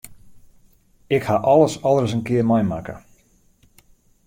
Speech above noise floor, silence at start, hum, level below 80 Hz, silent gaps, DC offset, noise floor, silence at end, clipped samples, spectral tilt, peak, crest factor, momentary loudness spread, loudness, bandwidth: 39 dB; 0.05 s; none; -52 dBFS; none; under 0.1%; -57 dBFS; 1.3 s; under 0.1%; -7 dB/octave; -2 dBFS; 18 dB; 14 LU; -19 LUFS; 16.5 kHz